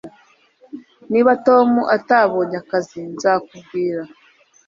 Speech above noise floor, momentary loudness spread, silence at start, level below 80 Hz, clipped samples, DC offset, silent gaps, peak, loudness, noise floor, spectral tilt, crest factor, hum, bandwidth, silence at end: 37 dB; 24 LU; 0.05 s; -66 dBFS; under 0.1%; under 0.1%; none; -2 dBFS; -17 LUFS; -54 dBFS; -6 dB/octave; 18 dB; none; 7.6 kHz; 0.6 s